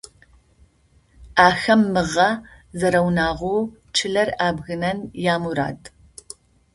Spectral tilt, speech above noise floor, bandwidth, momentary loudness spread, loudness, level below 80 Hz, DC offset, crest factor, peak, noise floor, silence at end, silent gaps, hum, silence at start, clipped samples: -5 dB/octave; 38 dB; 11.5 kHz; 20 LU; -20 LUFS; -48 dBFS; under 0.1%; 22 dB; 0 dBFS; -58 dBFS; 0.85 s; none; none; 1.2 s; under 0.1%